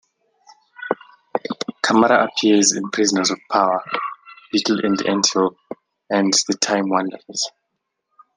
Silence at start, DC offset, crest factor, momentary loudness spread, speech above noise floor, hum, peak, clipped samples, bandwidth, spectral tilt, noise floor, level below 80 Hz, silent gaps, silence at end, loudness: 0.8 s; under 0.1%; 20 dB; 13 LU; 58 dB; none; 0 dBFS; under 0.1%; 10.5 kHz; -2.5 dB/octave; -76 dBFS; -68 dBFS; none; 0.9 s; -19 LUFS